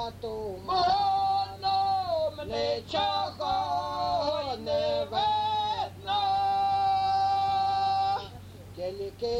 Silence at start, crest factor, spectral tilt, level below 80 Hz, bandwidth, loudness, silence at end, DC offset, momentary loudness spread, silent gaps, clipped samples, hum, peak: 0 s; 14 dB; -4.5 dB/octave; -54 dBFS; 14 kHz; -28 LUFS; 0 s; under 0.1%; 10 LU; none; under 0.1%; none; -14 dBFS